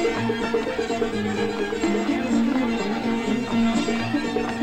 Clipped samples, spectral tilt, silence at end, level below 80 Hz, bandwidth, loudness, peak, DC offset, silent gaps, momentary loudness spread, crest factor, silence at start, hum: under 0.1%; -5.5 dB/octave; 0 s; -48 dBFS; 10 kHz; -24 LUFS; -12 dBFS; under 0.1%; none; 3 LU; 12 dB; 0 s; none